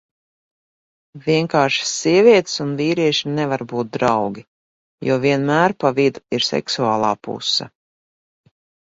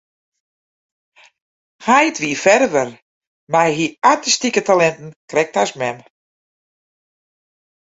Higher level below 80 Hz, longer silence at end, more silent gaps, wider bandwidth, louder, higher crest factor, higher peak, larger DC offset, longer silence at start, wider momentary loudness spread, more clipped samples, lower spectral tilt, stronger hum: about the same, -60 dBFS vs -62 dBFS; second, 1.15 s vs 1.8 s; about the same, 4.48-4.98 s vs 3.02-3.21 s, 3.27-3.47 s, 5.16-5.28 s; about the same, 8 kHz vs 8 kHz; about the same, -18 LUFS vs -16 LUFS; about the same, 18 dB vs 18 dB; about the same, 0 dBFS vs 0 dBFS; neither; second, 1.15 s vs 1.8 s; about the same, 9 LU vs 11 LU; neither; first, -4.5 dB/octave vs -3 dB/octave; neither